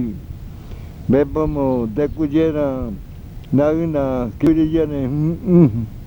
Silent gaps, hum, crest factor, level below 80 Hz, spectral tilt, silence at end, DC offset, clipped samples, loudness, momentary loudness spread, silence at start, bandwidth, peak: none; none; 18 dB; -34 dBFS; -10 dB/octave; 0 s; under 0.1%; under 0.1%; -18 LUFS; 20 LU; 0 s; 20 kHz; 0 dBFS